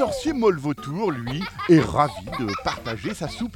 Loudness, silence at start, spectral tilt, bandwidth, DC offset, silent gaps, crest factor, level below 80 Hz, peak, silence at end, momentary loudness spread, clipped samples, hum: -23 LUFS; 0 s; -6 dB/octave; 16 kHz; under 0.1%; none; 20 dB; -46 dBFS; -4 dBFS; 0 s; 11 LU; under 0.1%; none